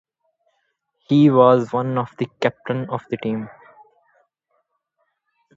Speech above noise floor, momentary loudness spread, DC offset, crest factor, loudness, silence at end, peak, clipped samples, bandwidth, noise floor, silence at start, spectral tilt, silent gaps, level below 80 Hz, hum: 54 dB; 14 LU; under 0.1%; 22 dB; -19 LUFS; 2.1 s; 0 dBFS; under 0.1%; 7.6 kHz; -72 dBFS; 1.1 s; -8.5 dB/octave; none; -66 dBFS; none